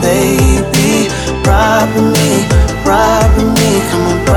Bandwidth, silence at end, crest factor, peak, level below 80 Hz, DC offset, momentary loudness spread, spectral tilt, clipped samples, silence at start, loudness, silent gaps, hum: 19.5 kHz; 0 s; 10 dB; 0 dBFS; -18 dBFS; under 0.1%; 3 LU; -5 dB/octave; under 0.1%; 0 s; -10 LUFS; none; none